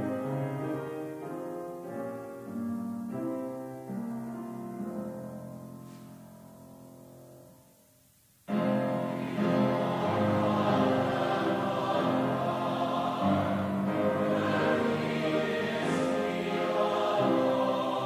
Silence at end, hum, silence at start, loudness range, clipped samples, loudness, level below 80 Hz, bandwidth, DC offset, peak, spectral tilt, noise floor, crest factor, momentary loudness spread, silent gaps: 0 s; none; 0 s; 13 LU; under 0.1%; -30 LUFS; -64 dBFS; 16 kHz; under 0.1%; -14 dBFS; -7 dB/octave; -63 dBFS; 16 dB; 15 LU; none